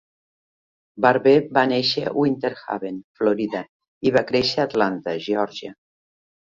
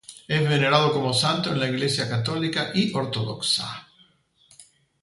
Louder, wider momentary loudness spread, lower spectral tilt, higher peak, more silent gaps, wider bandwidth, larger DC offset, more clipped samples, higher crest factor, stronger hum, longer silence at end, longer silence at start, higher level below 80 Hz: about the same, -21 LUFS vs -23 LUFS; first, 12 LU vs 7 LU; first, -6 dB/octave vs -4.5 dB/octave; about the same, -2 dBFS vs -4 dBFS; first, 3.04-3.15 s, 3.69-3.80 s, 3.88-4.01 s vs none; second, 7.6 kHz vs 11.5 kHz; neither; neither; about the same, 20 dB vs 20 dB; neither; first, 0.75 s vs 0.4 s; first, 0.95 s vs 0.1 s; about the same, -60 dBFS vs -60 dBFS